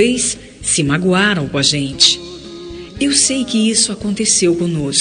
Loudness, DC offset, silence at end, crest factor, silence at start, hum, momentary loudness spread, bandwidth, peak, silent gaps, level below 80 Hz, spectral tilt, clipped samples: -14 LUFS; under 0.1%; 0 s; 16 dB; 0 s; none; 14 LU; 10.5 kHz; 0 dBFS; none; -42 dBFS; -3 dB/octave; under 0.1%